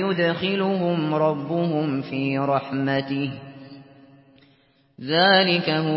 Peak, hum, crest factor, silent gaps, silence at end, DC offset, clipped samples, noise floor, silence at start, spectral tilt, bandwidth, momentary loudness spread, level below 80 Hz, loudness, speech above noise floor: -4 dBFS; none; 18 dB; none; 0 s; under 0.1%; under 0.1%; -60 dBFS; 0 s; -10.5 dB/octave; 5.8 kHz; 13 LU; -66 dBFS; -22 LUFS; 38 dB